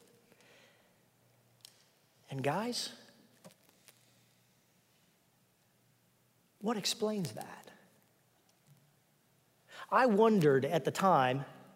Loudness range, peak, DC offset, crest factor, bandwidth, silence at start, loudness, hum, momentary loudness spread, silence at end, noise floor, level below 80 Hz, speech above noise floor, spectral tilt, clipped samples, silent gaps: 11 LU; -14 dBFS; under 0.1%; 22 dB; 16 kHz; 2.3 s; -31 LUFS; none; 21 LU; 0.2 s; -71 dBFS; -84 dBFS; 41 dB; -5 dB/octave; under 0.1%; none